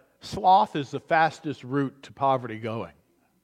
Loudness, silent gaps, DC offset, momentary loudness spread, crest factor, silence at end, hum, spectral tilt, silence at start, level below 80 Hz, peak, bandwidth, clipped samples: -25 LUFS; none; under 0.1%; 15 LU; 18 dB; 0.55 s; none; -6 dB/octave; 0.25 s; -62 dBFS; -8 dBFS; 11 kHz; under 0.1%